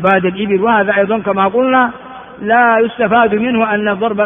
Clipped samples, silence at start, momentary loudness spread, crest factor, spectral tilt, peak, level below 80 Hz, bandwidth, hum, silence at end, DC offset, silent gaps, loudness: under 0.1%; 0 s; 5 LU; 12 dB; -4 dB/octave; 0 dBFS; -50 dBFS; 3.7 kHz; none; 0 s; under 0.1%; none; -12 LUFS